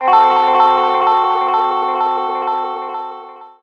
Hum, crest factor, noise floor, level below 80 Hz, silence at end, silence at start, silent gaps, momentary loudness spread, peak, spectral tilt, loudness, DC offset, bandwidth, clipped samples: none; 14 dB; -34 dBFS; -60 dBFS; 0.15 s; 0 s; none; 14 LU; 0 dBFS; -4 dB/octave; -14 LUFS; under 0.1%; 6.6 kHz; under 0.1%